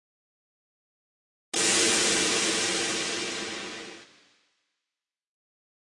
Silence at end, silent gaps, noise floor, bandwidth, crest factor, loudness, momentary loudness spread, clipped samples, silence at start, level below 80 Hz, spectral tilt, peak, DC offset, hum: 1.95 s; none; -90 dBFS; 11.5 kHz; 20 dB; -24 LUFS; 16 LU; under 0.1%; 1.55 s; -68 dBFS; -0.5 dB/octave; -10 dBFS; under 0.1%; none